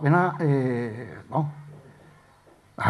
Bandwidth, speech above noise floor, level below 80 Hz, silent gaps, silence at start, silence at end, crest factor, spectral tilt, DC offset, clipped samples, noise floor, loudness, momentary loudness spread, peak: 11 kHz; 32 dB; -66 dBFS; none; 0 s; 0 s; 20 dB; -9 dB/octave; under 0.1%; under 0.1%; -56 dBFS; -26 LUFS; 24 LU; -6 dBFS